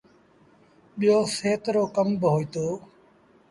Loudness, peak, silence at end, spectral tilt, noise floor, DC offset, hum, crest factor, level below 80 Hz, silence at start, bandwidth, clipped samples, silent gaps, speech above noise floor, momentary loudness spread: -24 LUFS; -8 dBFS; 0.7 s; -6 dB/octave; -58 dBFS; under 0.1%; none; 18 dB; -64 dBFS; 0.95 s; 11.5 kHz; under 0.1%; none; 34 dB; 10 LU